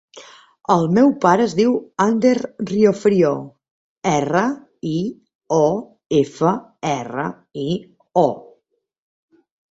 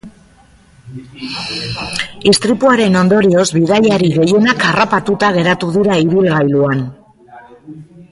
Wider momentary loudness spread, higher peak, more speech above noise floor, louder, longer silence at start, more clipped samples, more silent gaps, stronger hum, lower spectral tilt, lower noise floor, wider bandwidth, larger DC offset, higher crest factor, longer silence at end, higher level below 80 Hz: about the same, 12 LU vs 10 LU; about the same, -2 dBFS vs 0 dBFS; first, 50 dB vs 34 dB; second, -19 LUFS vs -12 LUFS; about the same, 0.15 s vs 0.05 s; neither; first, 3.71-3.96 s, 5.35-5.39 s vs none; neither; about the same, -6.5 dB/octave vs -5.5 dB/octave; first, -68 dBFS vs -46 dBFS; second, 8 kHz vs 11.5 kHz; neither; about the same, 18 dB vs 14 dB; first, 1.3 s vs 0.1 s; second, -60 dBFS vs -46 dBFS